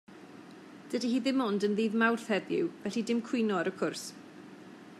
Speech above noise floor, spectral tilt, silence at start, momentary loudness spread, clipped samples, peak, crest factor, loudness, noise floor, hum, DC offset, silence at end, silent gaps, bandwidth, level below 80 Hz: 20 dB; -5 dB/octave; 0.1 s; 22 LU; under 0.1%; -14 dBFS; 18 dB; -31 LUFS; -50 dBFS; none; under 0.1%; 0 s; none; 13 kHz; -82 dBFS